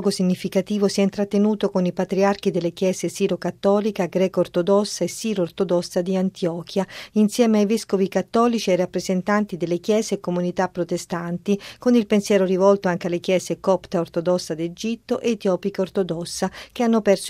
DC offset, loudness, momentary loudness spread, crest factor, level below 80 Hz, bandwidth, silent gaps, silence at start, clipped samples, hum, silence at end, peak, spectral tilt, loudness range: under 0.1%; -22 LUFS; 7 LU; 18 dB; -58 dBFS; 15.5 kHz; none; 0 s; under 0.1%; none; 0 s; -4 dBFS; -5.5 dB/octave; 3 LU